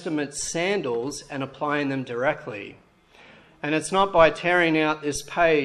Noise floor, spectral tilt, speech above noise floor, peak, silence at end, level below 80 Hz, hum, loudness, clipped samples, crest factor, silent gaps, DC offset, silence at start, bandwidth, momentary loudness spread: -52 dBFS; -4 dB/octave; 29 dB; -4 dBFS; 0 s; -54 dBFS; none; -24 LUFS; under 0.1%; 22 dB; none; under 0.1%; 0 s; 13 kHz; 14 LU